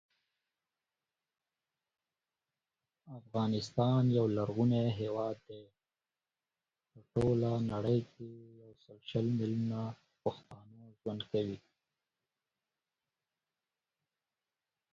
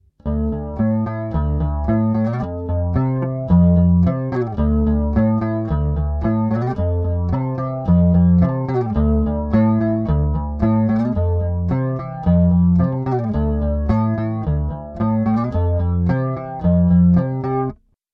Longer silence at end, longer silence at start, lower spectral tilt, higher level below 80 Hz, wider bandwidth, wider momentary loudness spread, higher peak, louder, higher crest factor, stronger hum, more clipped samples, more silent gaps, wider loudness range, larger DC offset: first, 3.35 s vs 0.4 s; first, 3.05 s vs 0.25 s; second, -8 dB/octave vs -12 dB/octave; second, -66 dBFS vs -26 dBFS; first, 7.6 kHz vs 4.5 kHz; first, 20 LU vs 8 LU; second, -18 dBFS vs -4 dBFS; second, -35 LUFS vs -18 LUFS; first, 20 dB vs 12 dB; neither; neither; neither; first, 11 LU vs 3 LU; neither